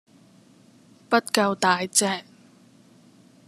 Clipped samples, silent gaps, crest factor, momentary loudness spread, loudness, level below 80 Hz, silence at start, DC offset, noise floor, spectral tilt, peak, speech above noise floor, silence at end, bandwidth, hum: under 0.1%; none; 24 dB; 6 LU; -22 LUFS; -70 dBFS; 1.1 s; under 0.1%; -54 dBFS; -2.5 dB/octave; -2 dBFS; 32 dB; 1.25 s; 14 kHz; none